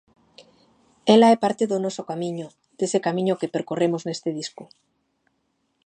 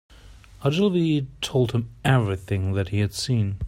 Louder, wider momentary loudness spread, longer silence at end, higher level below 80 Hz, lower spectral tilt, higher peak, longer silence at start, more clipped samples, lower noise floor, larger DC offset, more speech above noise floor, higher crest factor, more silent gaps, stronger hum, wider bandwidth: about the same, -22 LUFS vs -24 LUFS; first, 16 LU vs 5 LU; first, 1.2 s vs 0 s; second, -74 dBFS vs -46 dBFS; about the same, -5.5 dB/octave vs -6.5 dB/octave; first, -2 dBFS vs -6 dBFS; first, 1.05 s vs 0.25 s; neither; first, -72 dBFS vs -47 dBFS; neither; first, 50 dB vs 24 dB; about the same, 22 dB vs 18 dB; neither; neither; second, 9.8 kHz vs 15.5 kHz